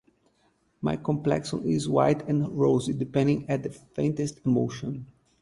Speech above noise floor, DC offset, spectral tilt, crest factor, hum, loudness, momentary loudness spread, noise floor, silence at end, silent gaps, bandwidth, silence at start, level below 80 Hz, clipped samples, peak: 42 dB; under 0.1%; -7 dB/octave; 20 dB; none; -27 LUFS; 9 LU; -68 dBFS; 0.35 s; none; 11.5 kHz; 0.8 s; -58 dBFS; under 0.1%; -8 dBFS